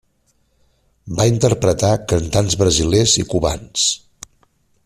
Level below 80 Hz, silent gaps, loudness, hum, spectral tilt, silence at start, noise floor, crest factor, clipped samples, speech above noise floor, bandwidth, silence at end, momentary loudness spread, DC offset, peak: -38 dBFS; none; -16 LUFS; none; -4.5 dB/octave; 1.05 s; -62 dBFS; 16 dB; under 0.1%; 46 dB; 14.5 kHz; 0.9 s; 6 LU; under 0.1%; -2 dBFS